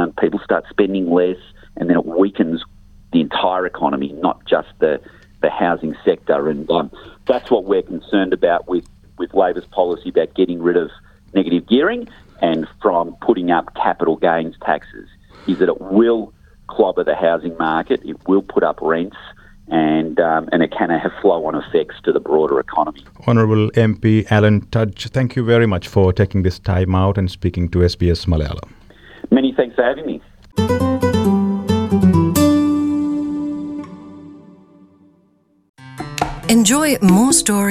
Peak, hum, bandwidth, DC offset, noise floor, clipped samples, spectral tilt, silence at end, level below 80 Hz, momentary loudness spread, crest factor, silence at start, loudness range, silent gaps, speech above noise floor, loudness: -2 dBFS; none; 15.5 kHz; under 0.1%; -57 dBFS; under 0.1%; -5.5 dB/octave; 0 s; -42 dBFS; 10 LU; 16 dB; 0 s; 3 LU; 35.69-35.74 s; 41 dB; -17 LUFS